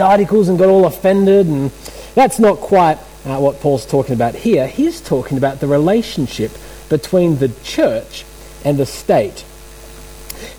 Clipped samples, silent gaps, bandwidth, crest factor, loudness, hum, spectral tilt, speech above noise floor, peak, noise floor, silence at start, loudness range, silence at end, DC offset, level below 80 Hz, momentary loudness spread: under 0.1%; none; over 20 kHz; 12 dB; -15 LUFS; none; -6.5 dB/octave; 22 dB; -2 dBFS; -36 dBFS; 0 s; 5 LU; 0 s; under 0.1%; -40 dBFS; 13 LU